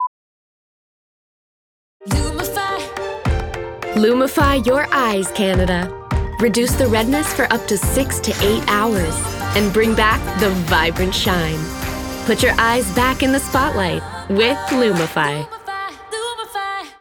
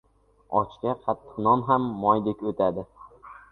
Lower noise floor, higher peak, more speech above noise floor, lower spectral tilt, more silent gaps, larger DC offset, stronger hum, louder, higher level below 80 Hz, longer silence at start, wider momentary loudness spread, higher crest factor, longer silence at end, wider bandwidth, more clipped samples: first, under -90 dBFS vs -47 dBFS; first, -2 dBFS vs -6 dBFS; first, over 74 dB vs 22 dB; second, -4.5 dB/octave vs -10 dB/octave; first, 0.07-2.00 s vs none; neither; neither; first, -18 LUFS vs -25 LUFS; first, -30 dBFS vs -58 dBFS; second, 0 s vs 0.5 s; about the same, 10 LU vs 10 LU; about the same, 18 dB vs 20 dB; about the same, 0.1 s vs 0.15 s; first, over 20 kHz vs 4.3 kHz; neither